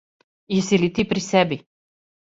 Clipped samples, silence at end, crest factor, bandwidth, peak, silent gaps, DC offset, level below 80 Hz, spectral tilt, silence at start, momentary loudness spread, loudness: under 0.1%; 0.65 s; 20 dB; 8 kHz; -2 dBFS; none; under 0.1%; -54 dBFS; -5 dB/octave; 0.5 s; 6 LU; -21 LUFS